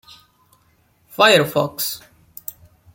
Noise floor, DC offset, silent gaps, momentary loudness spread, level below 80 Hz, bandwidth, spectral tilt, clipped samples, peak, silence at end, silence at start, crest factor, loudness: -59 dBFS; under 0.1%; none; 21 LU; -62 dBFS; 17 kHz; -3 dB/octave; under 0.1%; 0 dBFS; 0.95 s; 1.15 s; 20 dB; -16 LUFS